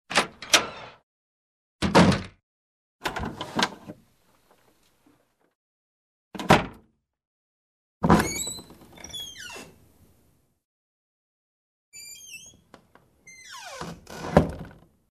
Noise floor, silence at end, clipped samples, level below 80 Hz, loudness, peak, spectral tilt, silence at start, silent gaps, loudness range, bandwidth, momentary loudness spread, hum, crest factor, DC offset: -65 dBFS; 0.4 s; under 0.1%; -46 dBFS; -24 LUFS; -2 dBFS; -4 dB/octave; 0.1 s; 1.03-1.79 s, 2.43-2.99 s, 5.55-6.31 s, 7.27-8.01 s, 10.64-11.92 s; 19 LU; 14 kHz; 23 LU; none; 28 dB; under 0.1%